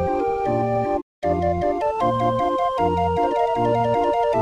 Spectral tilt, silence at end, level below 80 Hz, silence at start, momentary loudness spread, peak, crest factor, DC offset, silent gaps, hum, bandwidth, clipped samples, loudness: -7.5 dB/octave; 0 s; -44 dBFS; 0 s; 3 LU; -8 dBFS; 12 dB; under 0.1%; 1.02-1.22 s; none; 11 kHz; under 0.1%; -21 LUFS